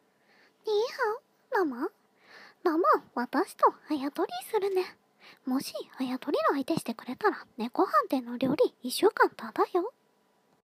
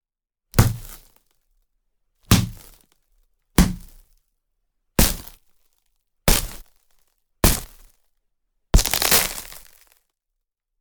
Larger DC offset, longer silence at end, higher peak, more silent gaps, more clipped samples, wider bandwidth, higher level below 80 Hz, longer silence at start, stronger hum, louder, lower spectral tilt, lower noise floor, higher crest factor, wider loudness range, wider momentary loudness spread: neither; second, 0.75 s vs 1.2 s; second, -10 dBFS vs 0 dBFS; neither; neither; second, 15.5 kHz vs over 20 kHz; second, -80 dBFS vs -30 dBFS; about the same, 0.65 s vs 0.55 s; neither; second, -29 LUFS vs -20 LUFS; about the same, -4.5 dB/octave vs -3.5 dB/octave; second, -69 dBFS vs -84 dBFS; about the same, 20 dB vs 24 dB; about the same, 3 LU vs 4 LU; second, 11 LU vs 23 LU